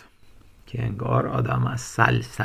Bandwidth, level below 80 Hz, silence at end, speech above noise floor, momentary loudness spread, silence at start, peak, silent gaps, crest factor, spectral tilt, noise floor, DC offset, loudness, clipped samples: 14 kHz; -46 dBFS; 0 s; 27 dB; 9 LU; 0.25 s; 0 dBFS; none; 24 dB; -6 dB/octave; -50 dBFS; under 0.1%; -24 LUFS; under 0.1%